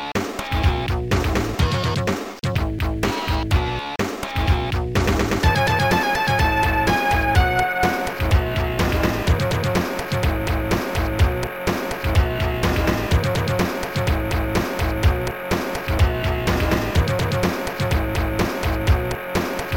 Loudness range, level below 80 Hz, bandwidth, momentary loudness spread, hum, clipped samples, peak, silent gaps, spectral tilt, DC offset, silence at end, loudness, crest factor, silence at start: 4 LU; -26 dBFS; 17 kHz; 6 LU; none; under 0.1%; -4 dBFS; none; -5.5 dB/octave; 0.2%; 0 s; -21 LUFS; 16 dB; 0 s